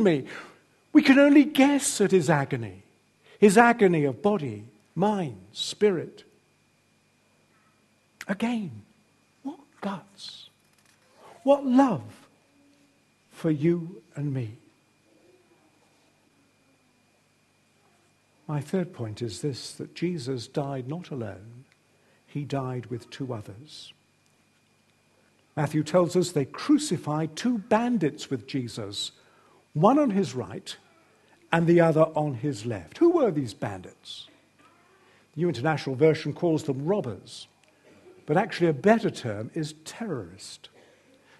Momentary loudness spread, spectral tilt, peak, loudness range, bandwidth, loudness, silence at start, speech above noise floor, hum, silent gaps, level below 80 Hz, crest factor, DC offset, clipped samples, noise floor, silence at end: 21 LU; -6 dB/octave; -2 dBFS; 13 LU; 12.5 kHz; -25 LUFS; 0 s; 41 dB; 50 Hz at -60 dBFS; none; -70 dBFS; 26 dB; under 0.1%; under 0.1%; -65 dBFS; 0.85 s